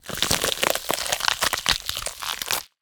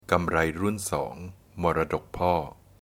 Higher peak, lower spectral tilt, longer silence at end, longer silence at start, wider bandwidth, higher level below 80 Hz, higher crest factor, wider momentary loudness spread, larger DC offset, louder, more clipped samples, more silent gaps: first, 0 dBFS vs -6 dBFS; second, -0.5 dB/octave vs -5.5 dB/octave; second, 0.15 s vs 0.3 s; about the same, 0.05 s vs 0.1 s; first, over 20 kHz vs 17.5 kHz; about the same, -48 dBFS vs -46 dBFS; about the same, 26 dB vs 22 dB; second, 7 LU vs 14 LU; neither; first, -23 LUFS vs -27 LUFS; neither; neither